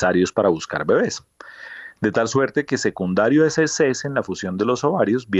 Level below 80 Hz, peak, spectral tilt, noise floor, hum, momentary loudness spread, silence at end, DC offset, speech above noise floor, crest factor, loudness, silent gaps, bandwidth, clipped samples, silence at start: -58 dBFS; -6 dBFS; -5 dB/octave; -39 dBFS; none; 11 LU; 0 s; under 0.1%; 19 dB; 14 dB; -20 LUFS; none; 8.2 kHz; under 0.1%; 0 s